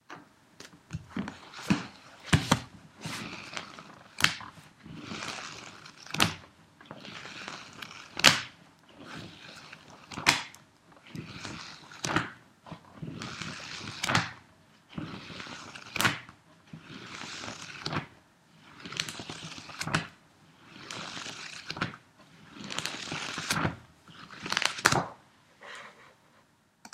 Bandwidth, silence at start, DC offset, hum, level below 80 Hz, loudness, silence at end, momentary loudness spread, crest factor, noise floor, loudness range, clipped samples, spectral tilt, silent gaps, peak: 16 kHz; 0.1 s; under 0.1%; none; -60 dBFS; -32 LUFS; 0.05 s; 23 LU; 36 dB; -65 dBFS; 9 LU; under 0.1%; -3 dB/octave; none; 0 dBFS